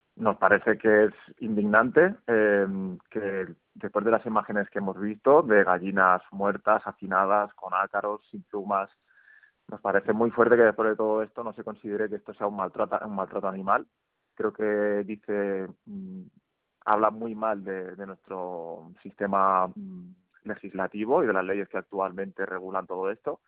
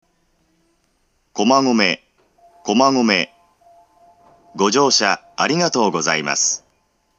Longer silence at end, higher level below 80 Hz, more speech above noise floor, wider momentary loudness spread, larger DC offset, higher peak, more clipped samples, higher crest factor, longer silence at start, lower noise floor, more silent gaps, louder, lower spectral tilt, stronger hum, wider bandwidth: second, 0.15 s vs 0.6 s; about the same, -70 dBFS vs -68 dBFS; second, 32 dB vs 48 dB; first, 17 LU vs 13 LU; neither; second, -4 dBFS vs 0 dBFS; neither; about the same, 22 dB vs 20 dB; second, 0.15 s vs 1.35 s; second, -58 dBFS vs -64 dBFS; neither; second, -26 LUFS vs -17 LUFS; first, -6 dB/octave vs -2.5 dB/octave; neither; second, 4.2 kHz vs 9.2 kHz